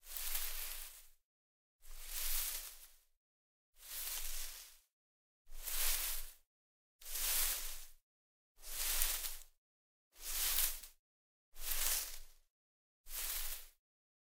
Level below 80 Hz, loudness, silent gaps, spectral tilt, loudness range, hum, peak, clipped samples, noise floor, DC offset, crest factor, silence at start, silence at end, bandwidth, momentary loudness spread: -50 dBFS; -39 LUFS; 1.23-1.79 s, 3.17-3.73 s, 4.92-5.45 s, 6.47-6.99 s, 8.02-8.55 s, 9.58-10.11 s, 10.99-11.52 s, 12.50-13.04 s; 1.5 dB/octave; 5 LU; none; -12 dBFS; under 0.1%; under -90 dBFS; under 0.1%; 30 dB; 0.05 s; 0.6 s; 16 kHz; 20 LU